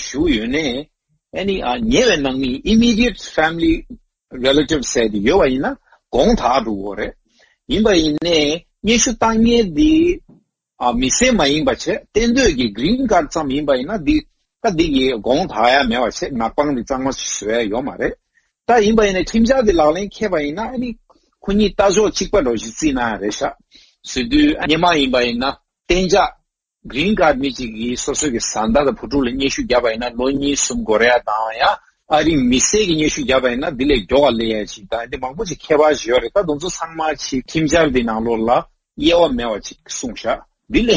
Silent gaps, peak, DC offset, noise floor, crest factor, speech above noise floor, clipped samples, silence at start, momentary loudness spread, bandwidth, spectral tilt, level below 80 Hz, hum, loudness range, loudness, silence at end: none; 0 dBFS; under 0.1%; -52 dBFS; 16 dB; 36 dB; under 0.1%; 0 s; 10 LU; 8 kHz; -3.5 dB/octave; -34 dBFS; none; 3 LU; -17 LUFS; 0 s